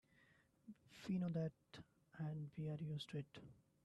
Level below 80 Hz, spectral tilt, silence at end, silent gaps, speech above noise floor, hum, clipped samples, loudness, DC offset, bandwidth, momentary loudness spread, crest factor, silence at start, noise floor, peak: -80 dBFS; -7.5 dB/octave; 0.3 s; none; 28 dB; none; under 0.1%; -48 LUFS; under 0.1%; 12 kHz; 20 LU; 16 dB; 0.65 s; -75 dBFS; -34 dBFS